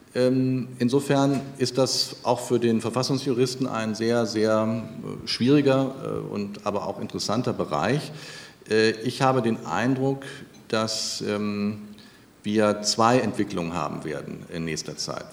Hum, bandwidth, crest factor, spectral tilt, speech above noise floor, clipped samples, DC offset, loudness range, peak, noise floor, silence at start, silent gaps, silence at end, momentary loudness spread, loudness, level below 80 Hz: none; 16 kHz; 20 dB; -5 dB/octave; 26 dB; under 0.1%; under 0.1%; 3 LU; -4 dBFS; -50 dBFS; 0.15 s; none; 0 s; 12 LU; -25 LUFS; -62 dBFS